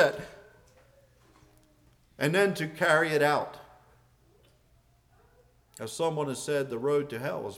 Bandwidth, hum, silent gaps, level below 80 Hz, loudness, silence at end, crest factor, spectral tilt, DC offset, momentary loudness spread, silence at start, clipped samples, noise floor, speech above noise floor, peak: 16.5 kHz; none; none; -66 dBFS; -28 LUFS; 0 s; 22 dB; -4.5 dB/octave; under 0.1%; 17 LU; 0 s; under 0.1%; -64 dBFS; 36 dB; -10 dBFS